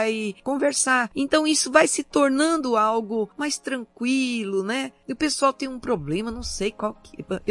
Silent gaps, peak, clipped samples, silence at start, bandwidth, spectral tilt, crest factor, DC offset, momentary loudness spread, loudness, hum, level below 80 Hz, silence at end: none; -2 dBFS; under 0.1%; 0 s; 11.5 kHz; -3 dB/octave; 22 dB; under 0.1%; 11 LU; -23 LUFS; none; -50 dBFS; 0 s